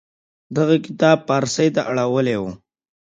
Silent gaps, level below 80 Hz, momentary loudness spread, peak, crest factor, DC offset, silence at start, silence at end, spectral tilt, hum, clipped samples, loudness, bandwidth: none; -58 dBFS; 8 LU; 0 dBFS; 18 dB; under 0.1%; 0.5 s; 0.5 s; -5.5 dB/octave; none; under 0.1%; -19 LUFS; 9.4 kHz